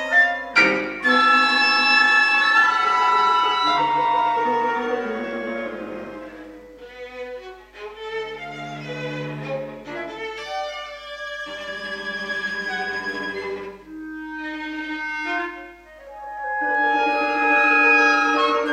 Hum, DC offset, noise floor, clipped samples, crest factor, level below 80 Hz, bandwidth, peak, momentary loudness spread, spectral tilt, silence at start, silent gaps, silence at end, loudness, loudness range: 50 Hz at -55 dBFS; under 0.1%; -42 dBFS; under 0.1%; 18 dB; -56 dBFS; 13.5 kHz; -4 dBFS; 20 LU; -3.5 dB/octave; 0 s; none; 0 s; -19 LUFS; 16 LU